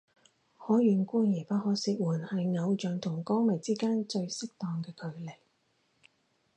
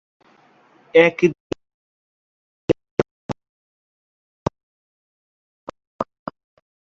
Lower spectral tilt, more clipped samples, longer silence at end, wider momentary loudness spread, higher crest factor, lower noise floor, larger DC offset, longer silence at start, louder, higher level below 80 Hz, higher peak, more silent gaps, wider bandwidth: about the same, -6.5 dB/octave vs -6.5 dB/octave; neither; first, 1.25 s vs 0.8 s; second, 14 LU vs 24 LU; second, 16 dB vs 24 dB; first, -73 dBFS vs -55 dBFS; neither; second, 0.6 s vs 0.95 s; second, -31 LUFS vs -21 LUFS; second, -80 dBFS vs -54 dBFS; second, -14 dBFS vs -2 dBFS; second, none vs 1.40-1.50 s, 1.74-2.68 s, 2.91-2.97 s, 3.11-3.29 s, 3.49-4.46 s, 4.63-5.67 s, 5.87-5.99 s; first, 9.8 kHz vs 7.4 kHz